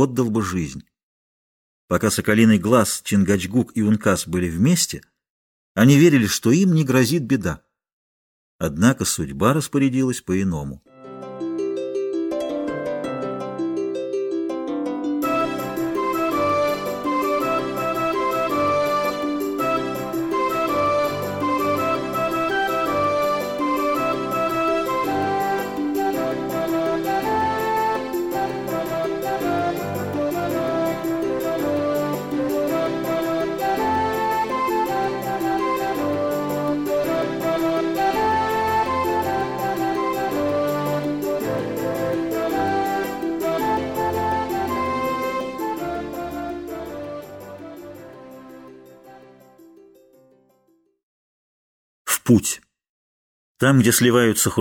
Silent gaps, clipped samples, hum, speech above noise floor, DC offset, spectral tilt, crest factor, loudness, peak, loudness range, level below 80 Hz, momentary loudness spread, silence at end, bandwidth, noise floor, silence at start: 1.03-1.88 s, 5.29-5.75 s, 7.93-8.59 s, 51.03-52.05 s, 52.89-53.55 s; under 0.1%; none; 45 dB; under 0.1%; -5 dB/octave; 18 dB; -21 LUFS; -2 dBFS; 7 LU; -50 dBFS; 10 LU; 0 s; 16.5 kHz; -63 dBFS; 0 s